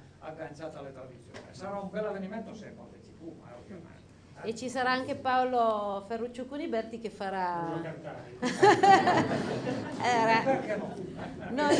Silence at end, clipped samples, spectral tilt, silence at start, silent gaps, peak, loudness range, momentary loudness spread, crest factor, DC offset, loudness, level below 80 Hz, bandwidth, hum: 0 s; under 0.1%; -5 dB/octave; 0 s; none; -8 dBFS; 15 LU; 24 LU; 22 dB; under 0.1%; -29 LUFS; -66 dBFS; 10 kHz; none